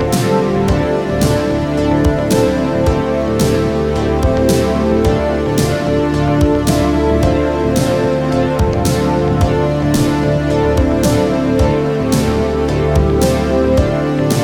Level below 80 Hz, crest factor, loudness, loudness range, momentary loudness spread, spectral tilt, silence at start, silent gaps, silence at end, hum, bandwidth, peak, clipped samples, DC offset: -24 dBFS; 14 dB; -14 LUFS; 1 LU; 2 LU; -6.5 dB/octave; 0 s; none; 0 s; none; 18 kHz; 0 dBFS; under 0.1%; under 0.1%